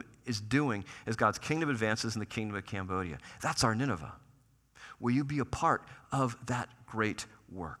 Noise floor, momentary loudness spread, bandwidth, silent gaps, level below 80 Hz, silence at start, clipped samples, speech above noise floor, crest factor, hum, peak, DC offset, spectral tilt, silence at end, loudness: -65 dBFS; 12 LU; 14.5 kHz; none; -60 dBFS; 0 s; under 0.1%; 32 dB; 22 dB; none; -12 dBFS; under 0.1%; -5 dB/octave; 0.05 s; -33 LUFS